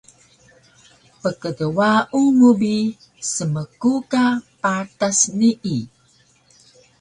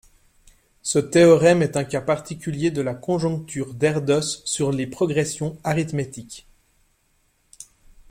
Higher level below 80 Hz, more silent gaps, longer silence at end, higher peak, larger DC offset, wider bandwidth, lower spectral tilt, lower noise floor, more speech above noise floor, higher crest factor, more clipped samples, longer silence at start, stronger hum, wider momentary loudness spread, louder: second, -60 dBFS vs -54 dBFS; neither; first, 1.15 s vs 0.45 s; about the same, -4 dBFS vs -4 dBFS; neither; second, 11 kHz vs 16 kHz; about the same, -4.5 dB/octave vs -5.5 dB/octave; second, -57 dBFS vs -65 dBFS; second, 39 dB vs 44 dB; about the same, 16 dB vs 18 dB; neither; first, 1.25 s vs 0.85 s; neither; second, 12 LU vs 15 LU; about the same, -19 LUFS vs -21 LUFS